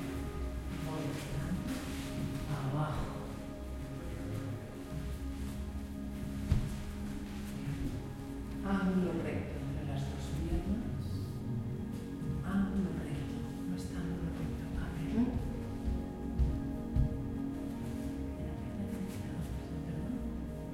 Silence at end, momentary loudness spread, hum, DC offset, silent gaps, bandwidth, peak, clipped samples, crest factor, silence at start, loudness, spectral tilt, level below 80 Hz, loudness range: 0 s; 8 LU; none; under 0.1%; none; 16.5 kHz; -16 dBFS; under 0.1%; 22 dB; 0 s; -38 LUFS; -7 dB/octave; -44 dBFS; 3 LU